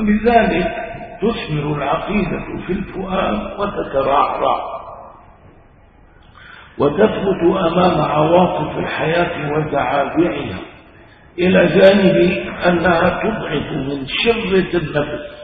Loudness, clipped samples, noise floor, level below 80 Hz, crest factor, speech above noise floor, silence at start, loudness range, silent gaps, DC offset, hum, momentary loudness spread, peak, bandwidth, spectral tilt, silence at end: -16 LUFS; under 0.1%; -46 dBFS; -38 dBFS; 16 dB; 30 dB; 0 s; 6 LU; none; under 0.1%; none; 11 LU; 0 dBFS; 4.8 kHz; -9.5 dB/octave; 0 s